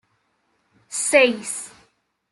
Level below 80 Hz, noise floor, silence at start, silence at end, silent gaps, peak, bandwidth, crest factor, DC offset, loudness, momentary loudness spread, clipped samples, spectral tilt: -70 dBFS; -68 dBFS; 0.9 s; 0.65 s; none; -2 dBFS; 12 kHz; 22 dB; under 0.1%; -20 LUFS; 15 LU; under 0.1%; -1 dB/octave